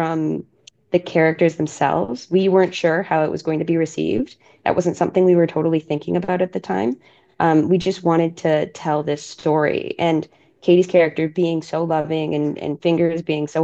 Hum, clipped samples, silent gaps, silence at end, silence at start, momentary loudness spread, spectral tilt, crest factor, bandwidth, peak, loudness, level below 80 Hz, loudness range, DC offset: none; under 0.1%; none; 0 s; 0 s; 7 LU; -7 dB/octave; 18 dB; 8.2 kHz; -2 dBFS; -19 LUFS; -58 dBFS; 1 LU; under 0.1%